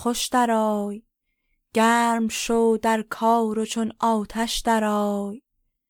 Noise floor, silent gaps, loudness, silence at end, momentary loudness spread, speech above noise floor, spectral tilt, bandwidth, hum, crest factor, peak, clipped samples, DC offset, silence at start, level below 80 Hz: -73 dBFS; none; -22 LUFS; 0.5 s; 8 LU; 51 dB; -4 dB/octave; 19 kHz; none; 14 dB; -8 dBFS; under 0.1%; under 0.1%; 0 s; -50 dBFS